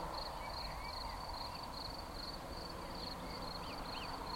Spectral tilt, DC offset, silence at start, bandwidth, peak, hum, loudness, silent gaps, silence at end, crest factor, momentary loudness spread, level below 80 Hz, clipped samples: -4 dB/octave; under 0.1%; 0 s; 16.5 kHz; -32 dBFS; none; -45 LUFS; none; 0 s; 14 dB; 2 LU; -52 dBFS; under 0.1%